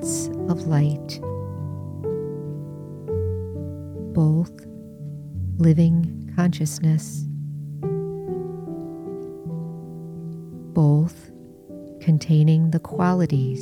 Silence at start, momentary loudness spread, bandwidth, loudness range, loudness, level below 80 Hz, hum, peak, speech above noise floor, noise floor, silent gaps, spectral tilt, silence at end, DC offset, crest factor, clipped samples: 0 s; 17 LU; 13.5 kHz; 8 LU; -23 LUFS; -52 dBFS; none; -6 dBFS; 24 dB; -44 dBFS; none; -7.5 dB/octave; 0 s; under 0.1%; 18 dB; under 0.1%